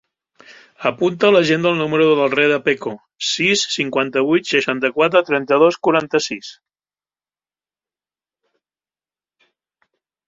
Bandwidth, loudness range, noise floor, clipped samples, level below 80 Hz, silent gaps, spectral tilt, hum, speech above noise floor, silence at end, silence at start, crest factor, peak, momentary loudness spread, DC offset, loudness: 7.8 kHz; 5 LU; under -90 dBFS; under 0.1%; -64 dBFS; none; -4 dB/octave; none; over 73 dB; 3.75 s; 0.8 s; 18 dB; -2 dBFS; 9 LU; under 0.1%; -16 LUFS